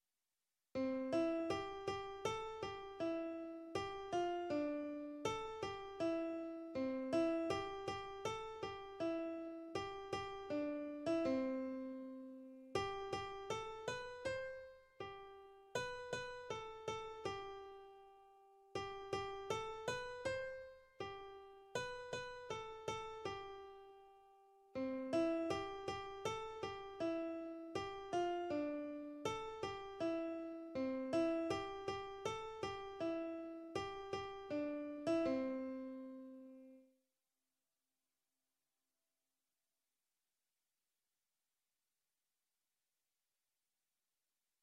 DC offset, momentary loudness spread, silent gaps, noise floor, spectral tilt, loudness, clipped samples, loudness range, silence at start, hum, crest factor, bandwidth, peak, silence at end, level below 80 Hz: under 0.1%; 13 LU; none; under -90 dBFS; -5 dB/octave; -44 LUFS; under 0.1%; 6 LU; 0.75 s; none; 20 dB; 12 kHz; -26 dBFS; 7.8 s; -70 dBFS